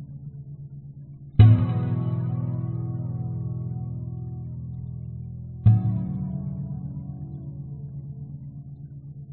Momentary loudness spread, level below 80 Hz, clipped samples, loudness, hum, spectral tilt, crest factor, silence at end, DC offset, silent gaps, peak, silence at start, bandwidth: 20 LU; -42 dBFS; under 0.1%; -26 LUFS; none; -10 dB/octave; 22 dB; 0 s; under 0.1%; none; -4 dBFS; 0 s; 4.1 kHz